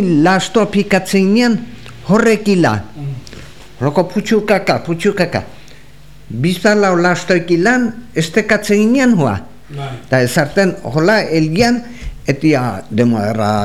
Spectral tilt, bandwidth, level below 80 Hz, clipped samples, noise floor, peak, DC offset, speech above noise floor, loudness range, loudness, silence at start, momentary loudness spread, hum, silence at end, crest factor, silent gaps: -6 dB/octave; 15 kHz; -40 dBFS; under 0.1%; -41 dBFS; 0 dBFS; 2%; 27 dB; 3 LU; -14 LUFS; 0 s; 15 LU; none; 0 s; 14 dB; none